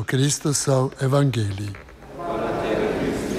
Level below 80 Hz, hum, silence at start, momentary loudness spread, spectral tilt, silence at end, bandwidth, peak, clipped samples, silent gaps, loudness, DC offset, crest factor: -46 dBFS; none; 0 s; 14 LU; -5 dB/octave; 0 s; 15 kHz; -6 dBFS; under 0.1%; none; -22 LUFS; under 0.1%; 16 dB